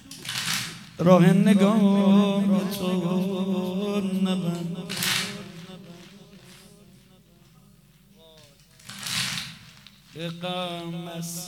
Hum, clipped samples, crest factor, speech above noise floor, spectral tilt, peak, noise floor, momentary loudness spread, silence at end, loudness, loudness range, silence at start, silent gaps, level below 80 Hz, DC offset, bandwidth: none; under 0.1%; 22 dB; 33 dB; -5.5 dB/octave; -4 dBFS; -55 dBFS; 20 LU; 0 s; -24 LUFS; 14 LU; 0.05 s; none; -64 dBFS; under 0.1%; 16.5 kHz